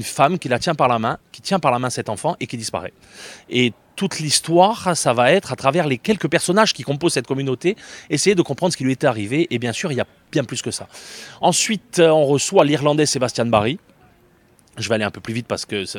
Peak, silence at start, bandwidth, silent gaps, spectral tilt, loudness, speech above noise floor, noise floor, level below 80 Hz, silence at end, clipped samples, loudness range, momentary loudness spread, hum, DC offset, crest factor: 0 dBFS; 0 s; 18 kHz; none; -4 dB/octave; -19 LUFS; 35 dB; -54 dBFS; -58 dBFS; 0 s; under 0.1%; 4 LU; 12 LU; none; under 0.1%; 20 dB